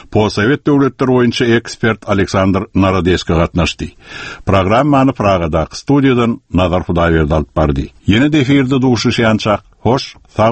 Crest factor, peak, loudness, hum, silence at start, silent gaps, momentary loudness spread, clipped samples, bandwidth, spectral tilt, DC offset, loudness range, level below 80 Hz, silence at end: 12 dB; 0 dBFS; -13 LUFS; none; 0.1 s; none; 6 LU; under 0.1%; 8.8 kHz; -6.5 dB/octave; under 0.1%; 1 LU; -30 dBFS; 0 s